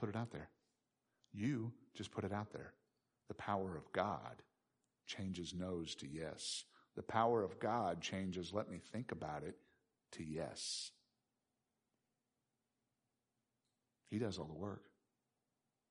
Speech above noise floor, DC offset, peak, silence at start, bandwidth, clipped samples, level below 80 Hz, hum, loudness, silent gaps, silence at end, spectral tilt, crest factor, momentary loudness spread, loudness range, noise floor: 46 dB; under 0.1%; -22 dBFS; 0 s; 10.5 kHz; under 0.1%; -74 dBFS; none; -44 LUFS; none; 1.05 s; -5 dB/octave; 24 dB; 15 LU; 9 LU; -89 dBFS